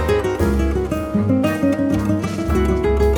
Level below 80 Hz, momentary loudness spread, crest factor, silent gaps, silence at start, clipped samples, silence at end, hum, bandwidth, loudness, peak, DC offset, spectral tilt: -24 dBFS; 3 LU; 14 dB; none; 0 s; under 0.1%; 0 s; none; 19.5 kHz; -19 LUFS; -4 dBFS; under 0.1%; -7.5 dB/octave